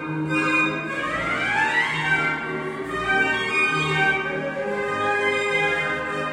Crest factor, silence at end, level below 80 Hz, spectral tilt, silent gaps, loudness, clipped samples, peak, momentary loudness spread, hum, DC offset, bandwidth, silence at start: 14 dB; 0 s; -54 dBFS; -4.5 dB/octave; none; -22 LUFS; under 0.1%; -8 dBFS; 7 LU; none; under 0.1%; 13 kHz; 0 s